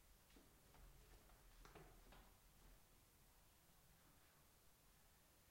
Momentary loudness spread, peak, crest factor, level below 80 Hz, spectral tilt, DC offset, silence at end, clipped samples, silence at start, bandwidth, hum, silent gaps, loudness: 4 LU; -50 dBFS; 20 dB; -74 dBFS; -3.5 dB/octave; under 0.1%; 0 s; under 0.1%; 0 s; 16.5 kHz; none; none; -68 LUFS